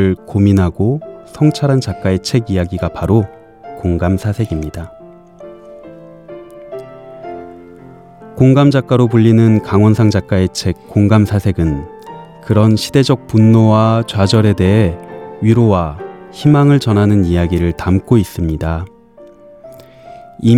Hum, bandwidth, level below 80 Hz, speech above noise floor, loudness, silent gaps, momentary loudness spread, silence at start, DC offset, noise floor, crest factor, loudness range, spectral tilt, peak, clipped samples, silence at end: none; 13.5 kHz; -38 dBFS; 29 dB; -13 LUFS; none; 21 LU; 0 s; 0.2%; -40 dBFS; 14 dB; 10 LU; -7.5 dB/octave; 0 dBFS; under 0.1%; 0 s